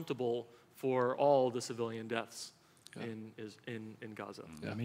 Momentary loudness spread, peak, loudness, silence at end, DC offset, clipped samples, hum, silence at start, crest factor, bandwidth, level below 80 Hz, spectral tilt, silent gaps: 18 LU; -18 dBFS; -37 LUFS; 0 s; under 0.1%; under 0.1%; none; 0 s; 20 dB; 16 kHz; -80 dBFS; -5.5 dB/octave; none